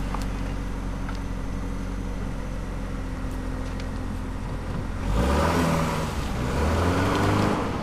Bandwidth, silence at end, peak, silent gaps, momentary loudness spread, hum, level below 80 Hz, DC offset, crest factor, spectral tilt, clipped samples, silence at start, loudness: 15.5 kHz; 0 s; -10 dBFS; none; 10 LU; none; -32 dBFS; under 0.1%; 16 dB; -6 dB/octave; under 0.1%; 0 s; -27 LUFS